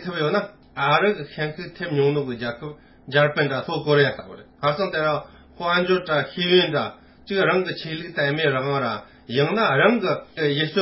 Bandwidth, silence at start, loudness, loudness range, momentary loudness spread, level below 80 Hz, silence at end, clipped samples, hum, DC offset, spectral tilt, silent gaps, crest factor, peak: 5.8 kHz; 0 s; -22 LUFS; 2 LU; 11 LU; -58 dBFS; 0 s; under 0.1%; none; under 0.1%; -9.5 dB/octave; none; 20 dB; -4 dBFS